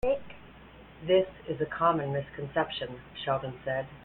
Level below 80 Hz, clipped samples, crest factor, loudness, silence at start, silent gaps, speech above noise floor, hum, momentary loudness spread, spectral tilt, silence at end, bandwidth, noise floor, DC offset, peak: -54 dBFS; under 0.1%; 18 dB; -31 LUFS; 0.05 s; none; 21 dB; none; 12 LU; -8.5 dB/octave; 0 s; 16.5 kHz; -51 dBFS; under 0.1%; -12 dBFS